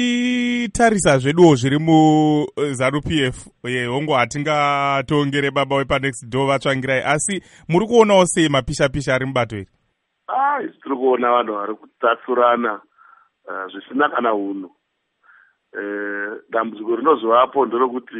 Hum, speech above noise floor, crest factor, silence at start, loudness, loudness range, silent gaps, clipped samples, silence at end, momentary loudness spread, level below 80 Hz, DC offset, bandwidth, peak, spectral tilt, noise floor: none; 52 dB; 18 dB; 0 s; -18 LUFS; 8 LU; none; under 0.1%; 0 s; 13 LU; -46 dBFS; under 0.1%; 11.5 kHz; 0 dBFS; -5 dB/octave; -70 dBFS